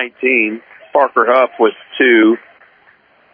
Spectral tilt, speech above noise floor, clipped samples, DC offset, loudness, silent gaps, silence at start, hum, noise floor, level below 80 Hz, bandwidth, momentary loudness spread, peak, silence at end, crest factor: -7.5 dB/octave; 37 dB; under 0.1%; under 0.1%; -13 LUFS; none; 0 s; none; -50 dBFS; -74 dBFS; 4.7 kHz; 9 LU; 0 dBFS; 0.95 s; 14 dB